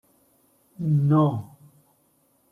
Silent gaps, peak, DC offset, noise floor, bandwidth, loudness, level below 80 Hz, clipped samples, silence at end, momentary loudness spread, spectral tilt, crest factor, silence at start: none; -8 dBFS; under 0.1%; -65 dBFS; 3.6 kHz; -23 LUFS; -66 dBFS; under 0.1%; 1.05 s; 16 LU; -10.5 dB/octave; 18 dB; 0.8 s